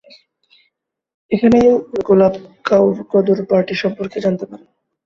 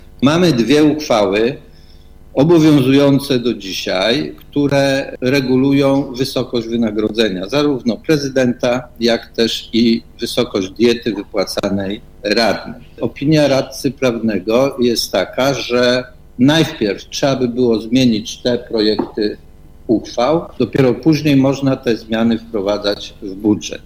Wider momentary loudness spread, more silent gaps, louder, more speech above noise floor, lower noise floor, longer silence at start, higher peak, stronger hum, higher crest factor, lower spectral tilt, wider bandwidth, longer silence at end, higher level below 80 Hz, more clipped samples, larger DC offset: about the same, 10 LU vs 8 LU; neither; about the same, -15 LUFS vs -15 LUFS; first, 54 dB vs 24 dB; first, -69 dBFS vs -39 dBFS; first, 1.3 s vs 0 s; about the same, -2 dBFS vs 0 dBFS; neither; about the same, 14 dB vs 16 dB; first, -7.5 dB/octave vs -5.5 dB/octave; second, 7.2 kHz vs 16 kHz; first, 0.5 s vs 0.05 s; second, -52 dBFS vs -42 dBFS; neither; neither